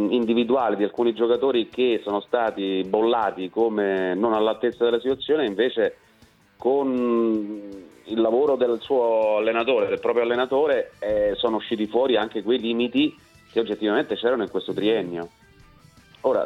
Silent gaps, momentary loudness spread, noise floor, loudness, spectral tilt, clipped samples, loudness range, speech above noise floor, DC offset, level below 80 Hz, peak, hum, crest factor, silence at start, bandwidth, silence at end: none; 6 LU; -56 dBFS; -23 LUFS; -6.5 dB/octave; under 0.1%; 2 LU; 34 dB; under 0.1%; -60 dBFS; -6 dBFS; none; 16 dB; 0 s; 7.4 kHz; 0 s